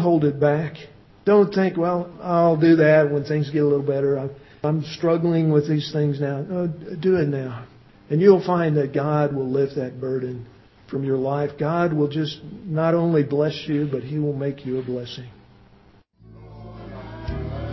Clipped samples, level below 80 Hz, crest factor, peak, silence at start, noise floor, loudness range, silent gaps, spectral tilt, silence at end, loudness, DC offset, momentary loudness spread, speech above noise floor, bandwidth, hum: under 0.1%; -48 dBFS; 18 dB; -2 dBFS; 0 s; -53 dBFS; 8 LU; none; -8.5 dB/octave; 0 s; -21 LUFS; under 0.1%; 15 LU; 33 dB; 6 kHz; none